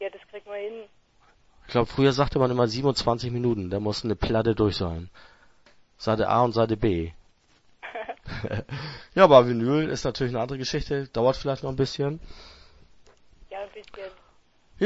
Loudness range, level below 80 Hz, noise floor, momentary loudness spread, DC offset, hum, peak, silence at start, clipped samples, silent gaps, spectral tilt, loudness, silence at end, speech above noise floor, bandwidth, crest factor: 7 LU; -44 dBFS; -61 dBFS; 17 LU; under 0.1%; none; -2 dBFS; 0 s; under 0.1%; none; -6.5 dB/octave; -24 LUFS; 0 s; 37 dB; 8 kHz; 24 dB